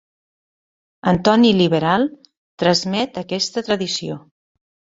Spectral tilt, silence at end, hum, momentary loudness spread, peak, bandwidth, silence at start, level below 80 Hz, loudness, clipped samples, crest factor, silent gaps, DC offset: -5 dB/octave; 0.75 s; none; 11 LU; -2 dBFS; 7.8 kHz; 1.05 s; -52 dBFS; -18 LUFS; under 0.1%; 18 dB; 2.37-2.58 s; under 0.1%